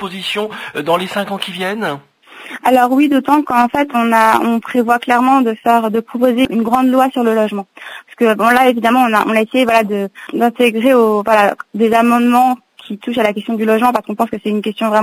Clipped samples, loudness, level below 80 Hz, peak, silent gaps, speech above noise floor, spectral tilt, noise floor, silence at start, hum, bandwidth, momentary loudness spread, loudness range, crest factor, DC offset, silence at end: under 0.1%; -14 LUFS; -56 dBFS; 0 dBFS; none; 19 dB; -5 dB/octave; -33 dBFS; 0 s; none; 16 kHz; 10 LU; 2 LU; 14 dB; under 0.1%; 0 s